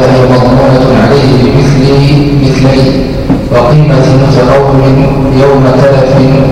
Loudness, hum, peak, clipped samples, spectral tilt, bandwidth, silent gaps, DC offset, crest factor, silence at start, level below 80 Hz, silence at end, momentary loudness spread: -5 LUFS; none; 0 dBFS; 1%; -7.5 dB/octave; 11 kHz; none; under 0.1%; 4 dB; 0 s; -20 dBFS; 0 s; 2 LU